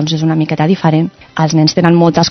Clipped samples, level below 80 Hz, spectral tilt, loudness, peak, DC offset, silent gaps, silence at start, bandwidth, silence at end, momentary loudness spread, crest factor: under 0.1%; -48 dBFS; -6 dB/octave; -12 LUFS; 0 dBFS; under 0.1%; none; 0 s; 6.4 kHz; 0 s; 6 LU; 12 dB